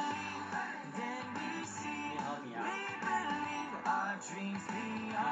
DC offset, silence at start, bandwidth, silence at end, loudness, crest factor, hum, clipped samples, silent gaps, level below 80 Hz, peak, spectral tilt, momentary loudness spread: under 0.1%; 0 s; 9 kHz; 0 s; -39 LUFS; 16 dB; none; under 0.1%; none; -80 dBFS; -22 dBFS; -4 dB/octave; 5 LU